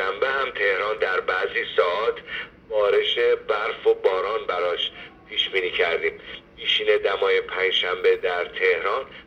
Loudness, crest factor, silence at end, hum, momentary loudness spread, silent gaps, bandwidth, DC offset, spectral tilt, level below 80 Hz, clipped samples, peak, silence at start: -22 LUFS; 18 dB; 0.05 s; none; 8 LU; none; 6.8 kHz; under 0.1%; -3 dB/octave; -58 dBFS; under 0.1%; -6 dBFS; 0 s